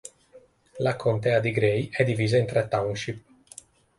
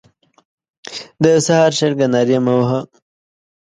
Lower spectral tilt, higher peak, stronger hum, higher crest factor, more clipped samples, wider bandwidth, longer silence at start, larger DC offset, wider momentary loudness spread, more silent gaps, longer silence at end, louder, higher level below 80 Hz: about the same, -6.5 dB/octave vs -5.5 dB/octave; second, -8 dBFS vs 0 dBFS; neither; about the same, 18 dB vs 18 dB; neither; about the same, 11.5 kHz vs 11.5 kHz; second, 0.05 s vs 0.85 s; neither; first, 23 LU vs 17 LU; neither; second, 0.8 s vs 0.95 s; second, -25 LUFS vs -15 LUFS; about the same, -58 dBFS vs -60 dBFS